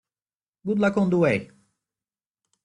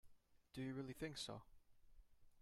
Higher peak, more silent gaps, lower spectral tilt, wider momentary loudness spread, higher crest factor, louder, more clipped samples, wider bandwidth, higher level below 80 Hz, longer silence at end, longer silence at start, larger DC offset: first, -8 dBFS vs -36 dBFS; neither; first, -8 dB/octave vs -4.5 dB/octave; about the same, 8 LU vs 9 LU; about the same, 18 dB vs 18 dB; first, -23 LUFS vs -51 LUFS; neither; second, 10 kHz vs 14.5 kHz; first, -62 dBFS vs -72 dBFS; first, 1.2 s vs 0 s; first, 0.65 s vs 0.05 s; neither